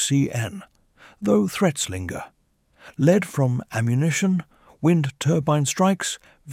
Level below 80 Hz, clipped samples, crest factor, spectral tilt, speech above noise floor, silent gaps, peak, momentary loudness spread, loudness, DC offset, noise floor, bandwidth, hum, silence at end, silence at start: -56 dBFS; under 0.1%; 18 dB; -5.5 dB/octave; 37 dB; none; -4 dBFS; 13 LU; -22 LUFS; under 0.1%; -58 dBFS; 16 kHz; none; 0 s; 0 s